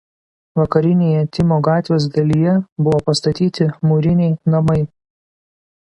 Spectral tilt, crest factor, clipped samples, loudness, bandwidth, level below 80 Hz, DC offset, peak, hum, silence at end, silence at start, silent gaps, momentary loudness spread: -7.5 dB/octave; 16 dB; under 0.1%; -16 LUFS; 10.5 kHz; -44 dBFS; under 0.1%; 0 dBFS; none; 1.1 s; 0.55 s; 2.72-2.76 s; 3 LU